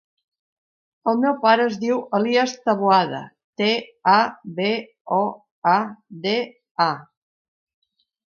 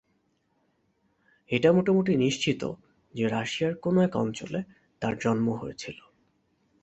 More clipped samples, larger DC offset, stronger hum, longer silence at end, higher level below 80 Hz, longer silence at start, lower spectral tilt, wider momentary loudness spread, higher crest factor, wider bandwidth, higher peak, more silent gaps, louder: neither; neither; neither; first, 1.3 s vs 0.9 s; second, -74 dBFS vs -62 dBFS; second, 1.05 s vs 1.5 s; about the same, -5 dB/octave vs -6 dB/octave; second, 10 LU vs 18 LU; about the same, 20 dB vs 22 dB; second, 7.2 kHz vs 8.2 kHz; first, -2 dBFS vs -8 dBFS; first, 3.44-3.53 s, 5.01-5.05 s, 5.51-5.62 s, 6.71-6.75 s vs none; first, -21 LUFS vs -27 LUFS